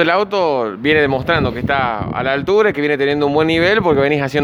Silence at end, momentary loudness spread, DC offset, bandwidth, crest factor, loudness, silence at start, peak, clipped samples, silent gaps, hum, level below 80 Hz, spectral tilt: 0 s; 5 LU; under 0.1%; 11.5 kHz; 14 dB; -15 LUFS; 0 s; 0 dBFS; under 0.1%; none; none; -40 dBFS; -6.5 dB/octave